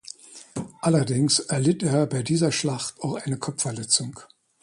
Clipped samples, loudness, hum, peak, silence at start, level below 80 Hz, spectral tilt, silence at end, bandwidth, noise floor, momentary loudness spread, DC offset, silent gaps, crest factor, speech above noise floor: under 0.1%; -24 LUFS; none; -6 dBFS; 0.3 s; -62 dBFS; -4.5 dB/octave; 0.4 s; 11.5 kHz; -44 dBFS; 15 LU; under 0.1%; none; 18 dB; 20 dB